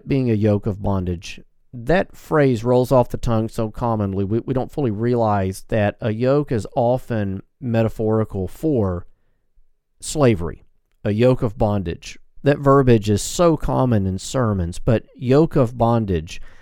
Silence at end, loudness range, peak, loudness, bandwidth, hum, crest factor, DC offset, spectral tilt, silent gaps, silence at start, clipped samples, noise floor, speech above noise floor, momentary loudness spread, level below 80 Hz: 0.05 s; 4 LU; -2 dBFS; -20 LUFS; 16.5 kHz; none; 18 dB; under 0.1%; -7 dB/octave; none; 0.05 s; under 0.1%; -55 dBFS; 36 dB; 11 LU; -36 dBFS